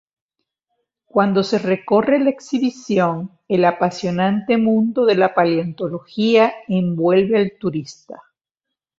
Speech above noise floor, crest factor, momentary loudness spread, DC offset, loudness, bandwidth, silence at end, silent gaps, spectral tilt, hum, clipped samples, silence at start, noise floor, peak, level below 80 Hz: 66 dB; 16 dB; 10 LU; under 0.1%; -18 LUFS; 7.8 kHz; 0.85 s; none; -7 dB/octave; none; under 0.1%; 1.15 s; -83 dBFS; -2 dBFS; -60 dBFS